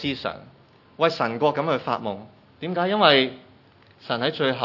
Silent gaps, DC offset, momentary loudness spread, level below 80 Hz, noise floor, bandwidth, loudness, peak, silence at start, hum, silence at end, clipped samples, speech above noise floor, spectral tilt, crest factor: none; under 0.1%; 18 LU; -66 dBFS; -54 dBFS; 6 kHz; -23 LUFS; 0 dBFS; 0 s; none; 0 s; under 0.1%; 31 dB; -6 dB/octave; 24 dB